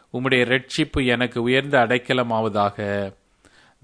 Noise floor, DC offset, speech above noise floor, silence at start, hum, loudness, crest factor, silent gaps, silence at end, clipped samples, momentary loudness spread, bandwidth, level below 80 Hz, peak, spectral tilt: -55 dBFS; under 0.1%; 34 dB; 0.15 s; none; -21 LUFS; 18 dB; none; 0.7 s; under 0.1%; 8 LU; 10.5 kHz; -44 dBFS; -4 dBFS; -5.5 dB/octave